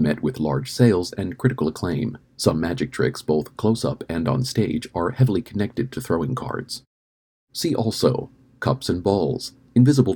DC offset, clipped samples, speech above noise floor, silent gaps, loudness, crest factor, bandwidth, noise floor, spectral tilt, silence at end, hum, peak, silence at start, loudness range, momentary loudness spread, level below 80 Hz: under 0.1%; under 0.1%; over 69 dB; 6.87-7.47 s; -23 LUFS; 20 dB; 19 kHz; under -90 dBFS; -6.5 dB/octave; 0 s; none; -2 dBFS; 0 s; 3 LU; 10 LU; -48 dBFS